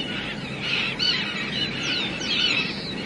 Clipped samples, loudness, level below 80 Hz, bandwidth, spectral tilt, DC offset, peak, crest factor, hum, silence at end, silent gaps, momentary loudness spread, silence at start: under 0.1%; -23 LUFS; -52 dBFS; 11.5 kHz; -3 dB/octave; under 0.1%; -10 dBFS; 16 dB; none; 0 s; none; 8 LU; 0 s